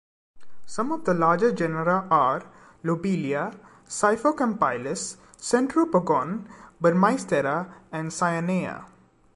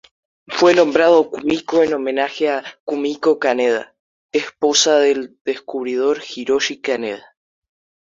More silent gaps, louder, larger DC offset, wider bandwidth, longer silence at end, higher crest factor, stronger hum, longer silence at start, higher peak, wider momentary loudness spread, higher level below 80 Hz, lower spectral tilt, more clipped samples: second, none vs 2.80-2.87 s, 3.99-4.29 s, 5.41-5.45 s; second, -25 LUFS vs -18 LUFS; neither; first, 11.5 kHz vs 7.6 kHz; second, 0.05 s vs 0.9 s; about the same, 18 dB vs 16 dB; neither; second, 0.35 s vs 0.5 s; second, -6 dBFS vs -2 dBFS; about the same, 13 LU vs 12 LU; about the same, -62 dBFS vs -62 dBFS; first, -5.5 dB/octave vs -2.5 dB/octave; neither